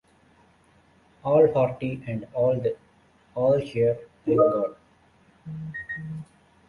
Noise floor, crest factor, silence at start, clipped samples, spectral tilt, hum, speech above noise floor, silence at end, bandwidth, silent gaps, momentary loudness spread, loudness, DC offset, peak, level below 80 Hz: -59 dBFS; 20 dB; 1.25 s; under 0.1%; -9 dB/octave; none; 36 dB; 0.45 s; 10.5 kHz; none; 17 LU; -25 LUFS; under 0.1%; -6 dBFS; -60 dBFS